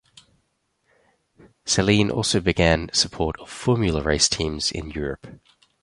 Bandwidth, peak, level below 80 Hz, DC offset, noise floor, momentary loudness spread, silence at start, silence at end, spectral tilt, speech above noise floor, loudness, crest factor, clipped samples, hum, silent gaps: 11.5 kHz; -4 dBFS; -38 dBFS; under 0.1%; -71 dBFS; 11 LU; 1.65 s; 0.45 s; -4 dB/octave; 49 dB; -21 LUFS; 20 dB; under 0.1%; none; none